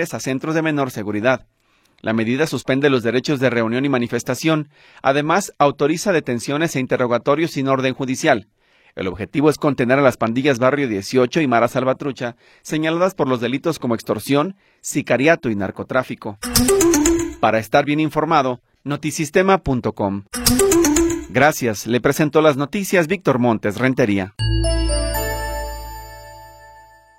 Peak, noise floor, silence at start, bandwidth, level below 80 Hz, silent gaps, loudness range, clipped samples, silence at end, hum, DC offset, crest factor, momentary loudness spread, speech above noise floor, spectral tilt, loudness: 0 dBFS; -46 dBFS; 0 s; 16.5 kHz; -34 dBFS; none; 3 LU; under 0.1%; 0.45 s; none; under 0.1%; 18 dB; 10 LU; 28 dB; -4.5 dB/octave; -18 LUFS